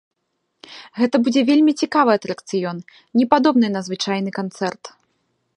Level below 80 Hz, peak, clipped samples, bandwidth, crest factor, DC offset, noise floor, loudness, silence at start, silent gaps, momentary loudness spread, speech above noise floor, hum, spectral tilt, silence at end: -68 dBFS; 0 dBFS; under 0.1%; 10.5 kHz; 20 dB; under 0.1%; -73 dBFS; -19 LUFS; 0.7 s; none; 13 LU; 55 dB; none; -5.5 dB/octave; 0.65 s